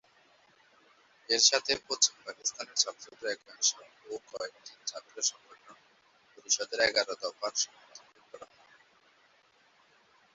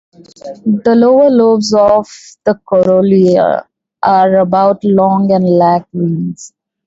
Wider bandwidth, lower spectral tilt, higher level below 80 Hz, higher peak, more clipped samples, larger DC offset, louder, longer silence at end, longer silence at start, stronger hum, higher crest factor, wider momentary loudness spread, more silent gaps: about the same, 8.2 kHz vs 8 kHz; second, 1.5 dB/octave vs -7 dB/octave; second, -76 dBFS vs -50 dBFS; second, -8 dBFS vs 0 dBFS; neither; neither; second, -30 LUFS vs -11 LUFS; first, 1.9 s vs 0.4 s; first, 1.3 s vs 0.45 s; neither; first, 26 dB vs 10 dB; first, 20 LU vs 11 LU; neither